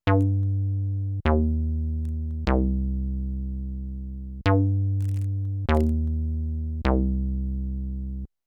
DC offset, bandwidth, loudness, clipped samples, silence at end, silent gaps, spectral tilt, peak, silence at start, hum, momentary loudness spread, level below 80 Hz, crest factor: under 0.1%; 5.8 kHz; -26 LUFS; under 0.1%; 0.2 s; none; -9.5 dB/octave; -6 dBFS; 0.05 s; none; 10 LU; -30 dBFS; 18 dB